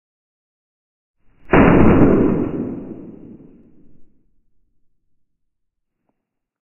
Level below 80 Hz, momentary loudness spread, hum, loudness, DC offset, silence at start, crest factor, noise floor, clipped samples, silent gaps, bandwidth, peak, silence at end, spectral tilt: -34 dBFS; 21 LU; none; -14 LUFS; under 0.1%; 1.5 s; 20 dB; -77 dBFS; under 0.1%; none; 3.1 kHz; 0 dBFS; 2.55 s; -10.5 dB/octave